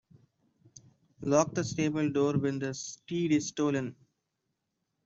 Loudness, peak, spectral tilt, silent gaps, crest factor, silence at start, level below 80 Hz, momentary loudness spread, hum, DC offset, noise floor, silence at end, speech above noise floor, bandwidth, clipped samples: -30 LUFS; -10 dBFS; -5.5 dB/octave; none; 22 dB; 1.2 s; -68 dBFS; 9 LU; none; under 0.1%; -83 dBFS; 1.1 s; 53 dB; 7.8 kHz; under 0.1%